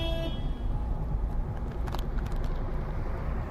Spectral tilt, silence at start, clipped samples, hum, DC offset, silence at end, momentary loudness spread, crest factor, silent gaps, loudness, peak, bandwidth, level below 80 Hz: -7 dB/octave; 0 s; under 0.1%; none; under 0.1%; 0 s; 2 LU; 14 dB; none; -35 LUFS; -16 dBFS; 12 kHz; -30 dBFS